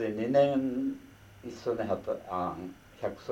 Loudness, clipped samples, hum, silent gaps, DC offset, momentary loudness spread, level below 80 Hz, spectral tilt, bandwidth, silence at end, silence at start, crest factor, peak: -31 LUFS; under 0.1%; none; none; under 0.1%; 20 LU; -62 dBFS; -7.5 dB/octave; 15.5 kHz; 0 s; 0 s; 18 dB; -14 dBFS